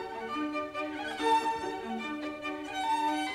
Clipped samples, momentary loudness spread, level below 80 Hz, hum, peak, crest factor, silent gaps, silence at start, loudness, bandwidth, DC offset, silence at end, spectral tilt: under 0.1%; 9 LU; -66 dBFS; none; -16 dBFS; 16 dB; none; 0 s; -33 LUFS; 15.5 kHz; under 0.1%; 0 s; -3 dB/octave